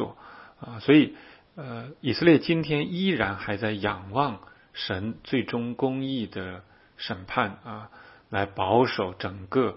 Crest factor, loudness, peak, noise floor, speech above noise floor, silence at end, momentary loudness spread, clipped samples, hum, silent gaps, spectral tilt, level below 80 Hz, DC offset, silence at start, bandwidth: 22 dB; -26 LUFS; -4 dBFS; -48 dBFS; 22 dB; 0 s; 21 LU; under 0.1%; none; none; -10 dB/octave; -58 dBFS; under 0.1%; 0 s; 5.8 kHz